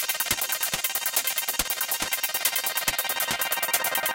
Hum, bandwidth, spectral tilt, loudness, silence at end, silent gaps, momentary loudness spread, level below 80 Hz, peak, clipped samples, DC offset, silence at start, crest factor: none; 17.5 kHz; 0.5 dB/octave; -24 LUFS; 0 s; none; 2 LU; -54 dBFS; -6 dBFS; under 0.1%; under 0.1%; 0 s; 20 dB